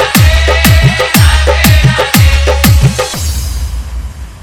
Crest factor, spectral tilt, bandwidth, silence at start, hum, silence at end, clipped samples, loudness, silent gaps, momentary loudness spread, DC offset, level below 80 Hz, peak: 8 dB; -4.5 dB/octave; over 20 kHz; 0 s; none; 0.05 s; 2%; -8 LUFS; none; 13 LU; under 0.1%; -12 dBFS; 0 dBFS